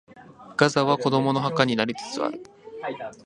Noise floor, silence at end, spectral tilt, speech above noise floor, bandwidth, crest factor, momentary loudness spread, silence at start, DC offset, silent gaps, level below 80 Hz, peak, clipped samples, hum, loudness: -47 dBFS; 0.1 s; -5.5 dB/octave; 23 dB; 11 kHz; 24 dB; 14 LU; 0.1 s; under 0.1%; none; -64 dBFS; -2 dBFS; under 0.1%; none; -24 LUFS